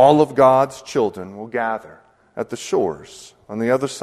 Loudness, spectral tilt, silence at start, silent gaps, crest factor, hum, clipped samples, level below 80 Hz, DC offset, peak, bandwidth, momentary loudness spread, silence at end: -19 LUFS; -5.5 dB/octave; 0 s; none; 18 dB; none; under 0.1%; -58 dBFS; under 0.1%; 0 dBFS; 13.5 kHz; 19 LU; 0 s